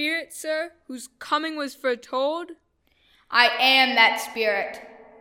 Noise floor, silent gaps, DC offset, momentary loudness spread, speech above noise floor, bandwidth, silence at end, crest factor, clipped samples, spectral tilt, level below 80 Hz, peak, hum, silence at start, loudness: -64 dBFS; none; under 0.1%; 20 LU; 41 dB; 17 kHz; 0.2 s; 22 dB; under 0.1%; -1 dB/octave; -72 dBFS; -2 dBFS; none; 0 s; -21 LUFS